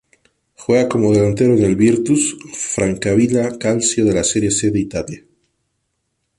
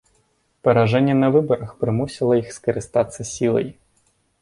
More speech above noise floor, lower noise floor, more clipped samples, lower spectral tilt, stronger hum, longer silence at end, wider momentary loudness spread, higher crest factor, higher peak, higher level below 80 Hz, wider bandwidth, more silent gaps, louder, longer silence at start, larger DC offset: first, 56 dB vs 45 dB; first, -71 dBFS vs -64 dBFS; neither; second, -5 dB/octave vs -6.5 dB/octave; neither; first, 1.2 s vs 0.7 s; about the same, 10 LU vs 8 LU; about the same, 14 dB vs 18 dB; about the same, -2 dBFS vs -2 dBFS; first, -44 dBFS vs -52 dBFS; about the same, 11.5 kHz vs 11.5 kHz; neither; first, -16 LUFS vs -20 LUFS; about the same, 0.6 s vs 0.65 s; neither